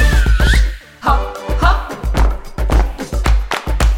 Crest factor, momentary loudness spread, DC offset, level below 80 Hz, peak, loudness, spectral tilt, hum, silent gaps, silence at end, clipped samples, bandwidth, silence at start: 14 dB; 8 LU; under 0.1%; -14 dBFS; 0 dBFS; -17 LUFS; -5 dB/octave; none; none; 0 s; under 0.1%; 14.5 kHz; 0 s